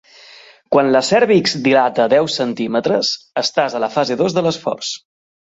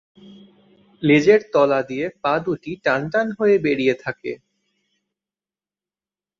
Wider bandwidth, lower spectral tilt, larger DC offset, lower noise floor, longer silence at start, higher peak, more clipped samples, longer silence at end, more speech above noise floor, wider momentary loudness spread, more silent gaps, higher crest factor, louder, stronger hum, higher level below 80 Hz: first, 8.2 kHz vs 7.4 kHz; second, -4.5 dB/octave vs -6.5 dB/octave; neither; second, -43 dBFS vs under -90 dBFS; first, 0.7 s vs 0.3 s; about the same, -2 dBFS vs -2 dBFS; neither; second, 0.6 s vs 2.05 s; second, 28 dB vs over 71 dB; second, 7 LU vs 12 LU; neither; about the same, 16 dB vs 18 dB; first, -16 LUFS vs -19 LUFS; neither; about the same, -60 dBFS vs -60 dBFS